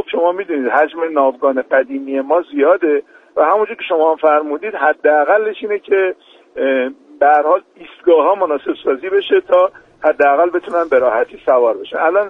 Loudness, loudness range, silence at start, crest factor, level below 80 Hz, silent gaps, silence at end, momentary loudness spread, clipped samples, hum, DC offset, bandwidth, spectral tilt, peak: -15 LUFS; 1 LU; 0 s; 14 dB; -62 dBFS; none; 0 s; 8 LU; under 0.1%; none; under 0.1%; 3.9 kHz; -5.5 dB/octave; 0 dBFS